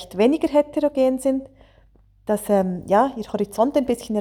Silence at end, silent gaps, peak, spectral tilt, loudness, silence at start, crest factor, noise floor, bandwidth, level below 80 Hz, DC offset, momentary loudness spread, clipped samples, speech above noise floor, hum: 0 s; none; -6 dBFS; -6 dB/octave; -21 LUFS; 0 s; 16 dB; -54 dBFS; 19 kHz; -52 dBFS; under 0.1%; 7 LU; under 0.1%; 34 dB; none